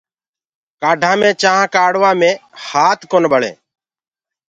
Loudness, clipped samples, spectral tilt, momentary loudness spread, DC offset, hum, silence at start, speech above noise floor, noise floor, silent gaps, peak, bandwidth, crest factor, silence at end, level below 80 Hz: -13 LUFS; under 0.1%; -3.5 dB/octave; 8 LU; under 0.1%; none; 0.8 s; over 77 dB; under -90 dBFS; none; 0 dBFS; 9.2 kHz; 16 dB; 0.95 s; -64 dBFS